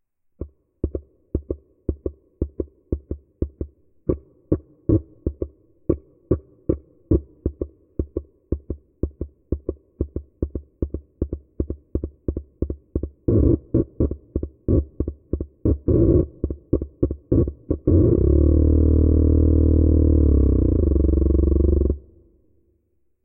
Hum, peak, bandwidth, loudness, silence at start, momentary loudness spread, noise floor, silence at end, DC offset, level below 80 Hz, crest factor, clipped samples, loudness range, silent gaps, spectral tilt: none; -4 dBFS; 1.5 kHz; -23 LUFS; 0.4 s; 15 LU; -67 dBFS; 1.25 s; under 0.1%; -26 dBFS; 18 dB; under 0.1%; 13 LU; none; -17 dB/octave